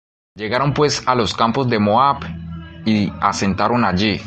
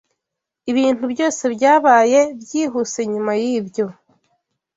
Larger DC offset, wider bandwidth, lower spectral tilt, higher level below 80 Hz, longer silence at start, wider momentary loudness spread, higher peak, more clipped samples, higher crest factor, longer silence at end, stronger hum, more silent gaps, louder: neither; first, 9 kHz vs 8 kHz; first, -5.5 dB/octave vs -4 dB/octave; first, -40 dBFS vs -66 dBFS; second, 0.35 s vs 0.65 s; about the same, 11 LU vs 11 LU; about the same, -2 dBFS vs -2 dBFS; neither; about the same, 16 dB vs 16 dB; second, 0 s vs 0.85 s; neither; neither; about the same, -17 LUFS vs -17 LUFS